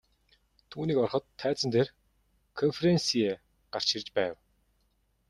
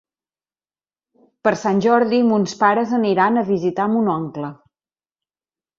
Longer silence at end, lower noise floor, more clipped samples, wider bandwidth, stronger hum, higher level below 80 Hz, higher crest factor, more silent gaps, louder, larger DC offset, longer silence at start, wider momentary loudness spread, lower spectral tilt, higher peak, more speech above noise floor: second, 0.95 s vs 1.25 s; second, -72 dBFS vs under -90 dBFS; neither; first, 12 kHz vs 7.6 kHz; neither; about the same, -66 dBFS vs -64 dBFS; about the same, 18 dB vs 18 dB; neither; second, -29 LUFS vs -18 LUFS; neither; second, 0.7 s vs 1.45 s; first, 12 LU vs 8 LU; second, -5 dB/octave vs -6.5 dB/octave; second, -12 dBFS vs -2 dBFS; second, 44 dB vs over 73 dB